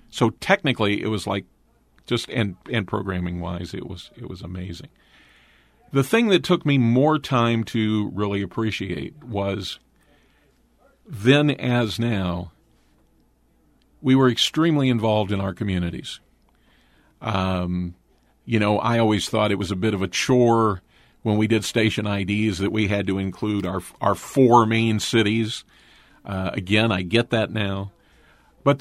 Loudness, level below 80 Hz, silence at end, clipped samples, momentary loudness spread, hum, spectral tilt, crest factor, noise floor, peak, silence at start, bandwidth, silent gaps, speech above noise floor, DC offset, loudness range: -22 LUFS; -52 dBFS; 0 s; under 0.1%; 14 LU; none; -6 dB/octave; 22 dB; -61 dBFS; -2 dBFS; 0.15 s; 15 kHz; none; 39 dB; under 0.1%; 7 LU